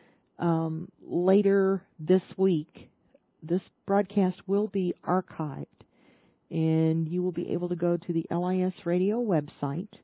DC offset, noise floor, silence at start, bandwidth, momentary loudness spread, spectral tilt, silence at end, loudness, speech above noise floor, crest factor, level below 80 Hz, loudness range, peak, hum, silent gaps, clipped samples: under 0.1%; -65 dBFS; 0.4 s; 4 kHz; 10 LU; -8.5 dB/octave; 0.15 s; -28 LUFS; 38 dB; 18 dB; -72 dBFS; 3 LU; -10 dBFS; none; none; under 0.1%